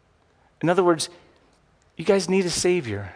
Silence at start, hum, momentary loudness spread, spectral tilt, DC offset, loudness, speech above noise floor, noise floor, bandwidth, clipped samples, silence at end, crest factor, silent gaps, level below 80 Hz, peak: 0.6 s; none; 8 LU; -4.5 dB/octave; under 0.1%; -22 LUFS; 39 dB; -61 dBFS; 10.5 kHz; under 0.1%; 0 s; 18 dB; none; -56 dBFS; -6 dBFS